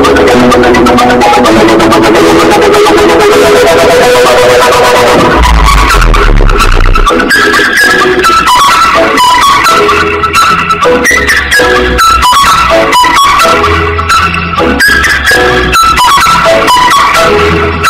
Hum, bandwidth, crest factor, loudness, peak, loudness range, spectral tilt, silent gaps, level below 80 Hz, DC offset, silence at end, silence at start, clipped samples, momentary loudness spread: none; 16.5 kHz; 4 dB; -4 LUFS; 0 dBFS; 1 LU; -3.5 dB/octave; none; -14 dBFS; under 0.1%; 0 s; 0 s; 4%; 3 LU